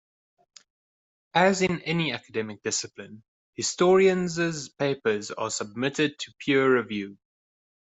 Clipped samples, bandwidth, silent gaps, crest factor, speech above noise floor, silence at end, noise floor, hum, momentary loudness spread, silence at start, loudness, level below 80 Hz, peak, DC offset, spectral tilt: under 0.1%; 8.2 kHz; 3.28-3.53 s; 22 dB; over 65 dB; 0.85 s; under -90 dBFS; none; 13 LU; 1.35 s; -25 LUFS; -66 dBFS; -6 dBFS; under 0.1%; -4 dB/octave